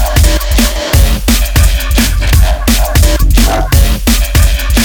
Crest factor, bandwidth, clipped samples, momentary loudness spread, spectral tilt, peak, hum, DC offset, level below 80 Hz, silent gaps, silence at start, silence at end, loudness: 8 dB; over 20 kHz; 0.4%; 2 LU; -4 dB/octave; 0 dBFS; none; under 0.1%; -10 dBFS; none; 0 s; 0 s; -10 LUFS